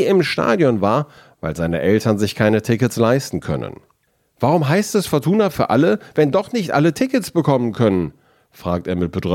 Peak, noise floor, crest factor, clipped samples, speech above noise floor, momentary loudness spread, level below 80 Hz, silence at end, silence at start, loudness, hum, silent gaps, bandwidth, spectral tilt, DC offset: -2 dBFS; -63 dBFS; 16 dB; under 0.1%; 46 dB; 8 LU; -50 dBFS; 0 s; 0 s; -18 LUFS; none; none; 17 kHz; -6.5 dB/octave; under 0.1%